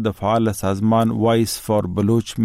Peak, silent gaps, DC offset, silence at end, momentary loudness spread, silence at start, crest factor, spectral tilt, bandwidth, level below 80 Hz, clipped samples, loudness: -8 dBFS; none; under 0.1%; 0 s; 3 LU; 0 s; 10 dB; -6.5 dB/octave; 16 kHz; -48 dBFS; under 0.1%; -19 LUFS